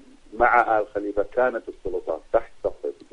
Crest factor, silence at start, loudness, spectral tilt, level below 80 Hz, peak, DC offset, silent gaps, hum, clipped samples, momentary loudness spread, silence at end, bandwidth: 20 dB; 0.3 s; -24 LUFS; -6.5 dB/octave; -46 dBFS; -6 dBFS; under 0.1%; none; none; under 0.1%; 13 LU; 0.2 s; 10 kHz